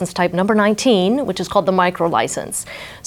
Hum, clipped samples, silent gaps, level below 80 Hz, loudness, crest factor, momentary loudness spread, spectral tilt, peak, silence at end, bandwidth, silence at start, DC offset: none; under 0.1%; none; -50 dBFS; -17 LUFS; 16 dB; 9 LU; -4.5 dB/octave; -2 dBFS; 0.05 s; 17 kHz; 0 s; under 0.1%